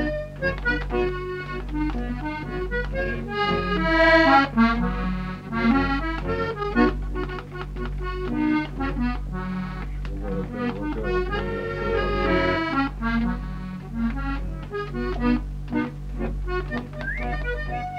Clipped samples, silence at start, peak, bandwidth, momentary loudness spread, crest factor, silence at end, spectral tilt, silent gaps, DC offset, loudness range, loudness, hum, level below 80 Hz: under 0.1%; 0 s; -6 dBFS; 8 kHz; 11 LU; 18 dB; 0 s; -7.5 dB/octave; none; under 0.1%; 8 LU; -25 LUFS; 50 Hz at -35 dBFS; -32 dBFS